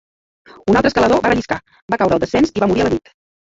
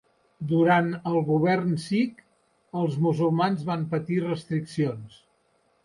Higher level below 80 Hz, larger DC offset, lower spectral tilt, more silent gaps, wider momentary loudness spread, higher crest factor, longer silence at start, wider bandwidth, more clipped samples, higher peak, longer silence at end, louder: first, -40 dBFS vs -66 dBFS; neither; second, -6 dB/octave vs -8 dB/octave; first, 1.82-1.88 s vs none; first, 11 LU vs 8 LU; about the same, 16 dB vs 16 dB; first, 0.65 s vs 0.4 s; second, 8 kHz vs 11.5 kHz; neither; first, -2 dBFS vs -10 dBFS; second, 0.45 s vs 0.75 s; first, -16 LUFS vs -25 LUFS